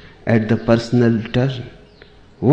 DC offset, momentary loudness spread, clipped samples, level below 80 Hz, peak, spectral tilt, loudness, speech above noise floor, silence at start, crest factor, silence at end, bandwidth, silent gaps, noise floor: under 0.1%; 9 LU; under 0.1%; -44 dBFS; -2 dBFS; -8 dB/octave; -18 LUFS; 29 dB; 0.25 s; 16 dB; 0 s; 8.4 kHz; none; -45 dBFS